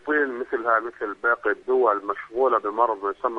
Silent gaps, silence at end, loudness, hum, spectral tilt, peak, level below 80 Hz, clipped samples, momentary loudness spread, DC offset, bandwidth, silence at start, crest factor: none; 0 s; -23 LUFS; none; -6 dB/octave; -6 dBFS; -64 dBFS; under 0.1%; 6 LU; under 0.1%; 5 kHz; 0.05 s; 18 dB